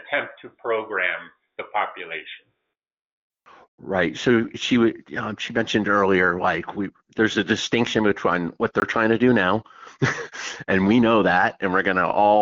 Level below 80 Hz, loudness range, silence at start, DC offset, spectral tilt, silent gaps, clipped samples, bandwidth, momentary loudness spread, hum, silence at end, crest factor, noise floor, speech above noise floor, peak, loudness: -56 dBFS; 9 LU; 0.05 s; under 0.1%; -5.5 dB/octave; 3.01-3.30 s, 3.68-3.78 s; under 0.1%; 7.6 kHz; 14 LU; none; 0 s; 16 dB; -80 dBFS; 58 dB; -6 dBFS; -21 LUFS